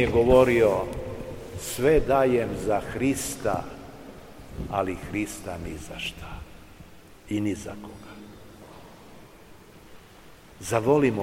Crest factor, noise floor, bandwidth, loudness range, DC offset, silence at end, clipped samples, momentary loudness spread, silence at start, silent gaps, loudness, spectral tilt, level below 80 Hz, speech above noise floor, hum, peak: 22 dB; -49 dBFS; 16.5 kHz; 13 LU; 0.2%; 0 s; under 0.1%; 25 LU; 0 s; none; -25 LUFS; -5.5 dB/octave; -42 dBFS; 25 dB; none; -6 dBFS